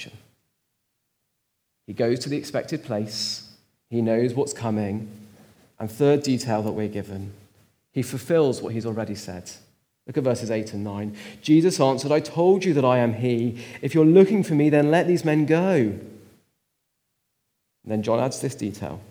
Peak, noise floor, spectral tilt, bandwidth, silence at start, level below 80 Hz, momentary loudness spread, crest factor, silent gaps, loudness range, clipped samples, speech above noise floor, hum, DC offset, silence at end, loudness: -4 dBFS; -76 dBFS; -6.5 dB/octave; over 20 kHz; 0 s; -70 dBFS; 15 LU; 20 dB; none; 9 LU; under 0.1%; 54 dB; none; under 0.1%; 0.05 s; -23 LUFS